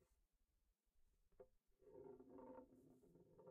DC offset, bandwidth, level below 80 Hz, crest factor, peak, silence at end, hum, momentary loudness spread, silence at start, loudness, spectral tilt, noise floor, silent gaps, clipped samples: under 0.1%; 2.8 kHz; -84 dBFS; 16 dB; -50 dBFS; 0 s; none; 6 LU; 0 s; -64 LUFS; -6 dB/octave; -87 dBFS; none; under 0.1%